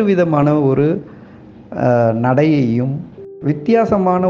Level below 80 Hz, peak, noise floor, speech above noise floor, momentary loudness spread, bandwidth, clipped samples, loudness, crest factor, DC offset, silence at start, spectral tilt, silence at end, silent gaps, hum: -50 dBFS; 0 dBFS; -39 dBFS; 25 dB; 11 LU; 7.2 kHz; under 0.1%; -15 LUFS; 14 dB; under 0.1%; 0 s; -9.5 dB/octave; 0 s; none; none